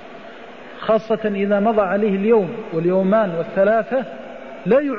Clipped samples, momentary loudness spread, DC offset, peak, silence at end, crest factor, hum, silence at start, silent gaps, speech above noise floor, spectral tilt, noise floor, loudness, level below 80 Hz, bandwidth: under 0.1%; 19 LU; 0.5%; -6 dBFS; 0 s; 14 dB; none; 0 s; none; 20 dB; -9 dB/octave; -38 dBFS; -19 LUFS; -58 dBFS; 6.8 kHz